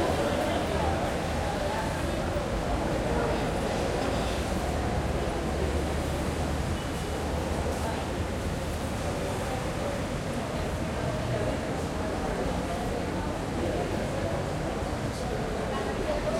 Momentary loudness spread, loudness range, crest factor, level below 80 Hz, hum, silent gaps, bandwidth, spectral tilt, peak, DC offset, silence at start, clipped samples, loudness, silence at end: 4 LU; 2 LU; 16 dB; -38 dBFS; none; none; 16.5 kHz; -5.5 dB/octave; -14 dBFS; under 0.1%; 0 s; under 0.1%; -30 LUFS; 0 s